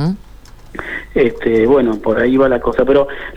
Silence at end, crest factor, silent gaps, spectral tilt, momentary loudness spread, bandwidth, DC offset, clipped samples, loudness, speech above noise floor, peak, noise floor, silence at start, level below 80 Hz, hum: 0 s; 14 dB; none; -8 dB/octave; 14 LU; 9 kHz; under 0.1%; under 0.1%; -14 LUFS; 24 dB; -2 dBFS; -37 dBFS; 0 s; -36 dBFS; none